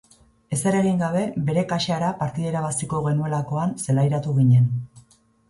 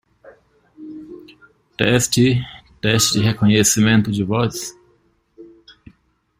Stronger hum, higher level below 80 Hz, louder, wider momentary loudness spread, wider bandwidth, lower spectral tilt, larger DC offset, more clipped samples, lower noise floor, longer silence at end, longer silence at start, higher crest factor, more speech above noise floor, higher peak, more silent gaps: neither; second, -54 dBFS vs -48 dBFS; second, -22 LUFS vs -17 LUFS; second, 8 LU vs 23 LU; second, 11.5 kHz vs 16 kHz; first, -6.5 dB/octave vs -4 dB/octave; neither; neither; second, -56 dBFS vs -60 dBFS; second, 0.5 s vs 0.95 s; second, 0.5 s vs 0.8 s; second, 14 dB vs 20 dB; second, 35 dB vs 44 dB; second, -8 dBFS vs 0 dBFS; neither